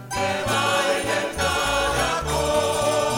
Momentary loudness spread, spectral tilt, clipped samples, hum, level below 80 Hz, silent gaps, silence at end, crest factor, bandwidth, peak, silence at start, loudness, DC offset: 3 LU; -3 dB/octave; under 0.1%; none; -38 dBFS; none; 0 s; 14 dB; 16.5 kHz; -8 dBFS; 0 s; -22 LUFS; under 0.1%